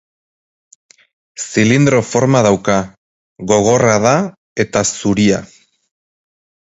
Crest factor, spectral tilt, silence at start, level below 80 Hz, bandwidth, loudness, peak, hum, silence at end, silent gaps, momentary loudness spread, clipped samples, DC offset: 16 dB; -5 dB/octave; 1.4 s; -48 dBFS; 8.2 kHz; -14 LUFS; 0 dBFS; none; 1.2 s; 2.98-3.36 s, 4.37-4.56 s; 11 LU; under 0.1%; under 0.1%